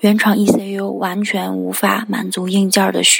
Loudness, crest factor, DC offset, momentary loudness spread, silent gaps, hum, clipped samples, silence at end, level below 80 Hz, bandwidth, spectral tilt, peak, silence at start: -16 LUFS; 16 dB; under 0.1%; 7 LU; none; none; under 0.1%; 0 s; -60 dBFS; 17 kHz; -3.5 dB/octave; 0 dBFS; 0 s